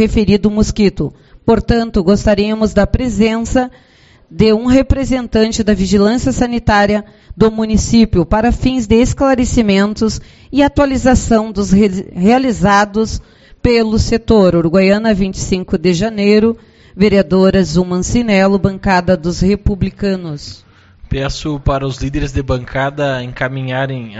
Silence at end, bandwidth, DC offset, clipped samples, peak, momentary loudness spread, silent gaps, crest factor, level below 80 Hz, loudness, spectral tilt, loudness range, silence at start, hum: 0 s; 8.2 kHz; under 0.1%; under 0.1%; 0 dBFS; 8 LU; none; 12 dB; -26 dBFS; -13 LUFS; -6 dB/octave; 5 LU; 0 s; none